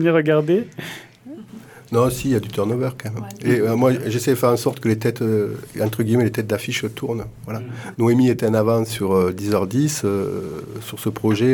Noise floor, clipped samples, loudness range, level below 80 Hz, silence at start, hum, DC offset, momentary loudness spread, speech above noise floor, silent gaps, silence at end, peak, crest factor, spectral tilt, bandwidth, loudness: -40 dBFS; under 0.1%; 3 LU; -52 dBFS; 0 s; none; under 0.1%; 14 LU; 21 dB; none; 0 s; -4 dBFS; 16 dB; -6.5 dB/octave; 19 kHz; -20 LUFS